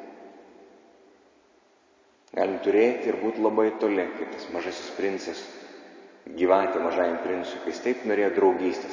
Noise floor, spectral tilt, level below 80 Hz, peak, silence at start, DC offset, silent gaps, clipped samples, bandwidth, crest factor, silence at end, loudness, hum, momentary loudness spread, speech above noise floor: -61 dBFS; -5 dB/octave; -68 dBFS; -8 dBFS; 0 s; under 0.1%; none; under 0.1%; 7.6 kHz; 20 dB; 0 s; -26 LUFS; none; 18 LU; 36 dB